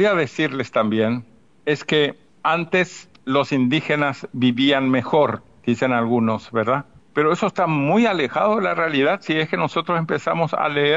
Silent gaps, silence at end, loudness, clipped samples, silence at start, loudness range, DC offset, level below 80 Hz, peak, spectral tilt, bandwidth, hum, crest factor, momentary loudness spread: none; 0 s; -20 LUFS; under 0.1%; 0 s; 2 LU; 0.2%; -64 dBFS; -4 dBFS; -6 dB/octave; 7.8 kHz; none; 14 dB; 6 LU